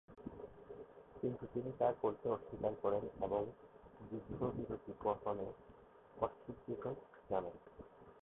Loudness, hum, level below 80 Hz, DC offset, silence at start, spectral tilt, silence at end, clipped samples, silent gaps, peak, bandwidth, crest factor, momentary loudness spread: -43 LUFS; none; -66 dBFS; under 0.1%; 0.1 s; -5.5 dB/octave; 0.05 s; under 0.1%; none; -20 dBFS; 3.9 kHz; 22 dB; 20 LU